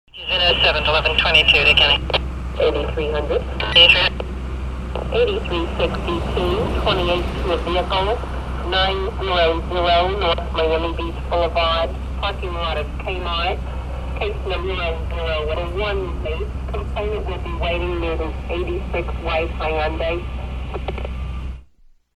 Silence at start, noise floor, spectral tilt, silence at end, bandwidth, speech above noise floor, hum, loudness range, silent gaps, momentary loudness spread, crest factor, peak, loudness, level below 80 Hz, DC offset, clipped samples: 0.15 s; -51 dBFS; -5.5 dB/octave; 0.25 s; 10 kHz; 31 dB; none; 9 LU; none; 14 LU; 20 dB; 0 dBFS; -19 LUFS; -26 dBFS; 0.4%; under 0.1%